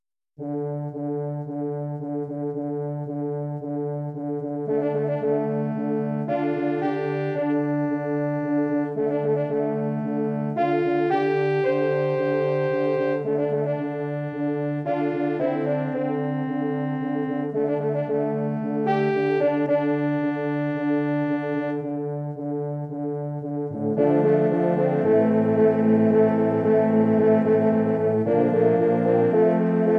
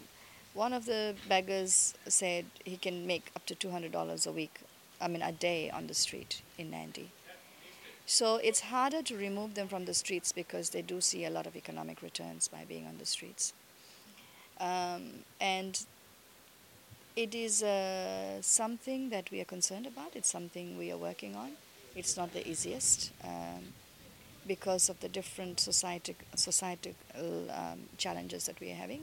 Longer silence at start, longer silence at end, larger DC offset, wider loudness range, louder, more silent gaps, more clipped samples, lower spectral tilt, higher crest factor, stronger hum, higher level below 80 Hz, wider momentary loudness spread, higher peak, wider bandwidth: first, 0.4 s vs 0 s; about the same, 0 s vs 0 s; neither; about the same, 7 LU vs 6 LU; first, -23 LUFS vs -34 LUFS; neither; neither; first, -10 dB/octave vs -1.5 dB/octave; second, 14 dB vs 24 dB; neither; about the same, -70 dBFS vs -72 dBFS; second, 10 LU vs 19 LU; first, -8 dBFS vs -14 dBFS; second, 5.4 kHz vs 17 kHz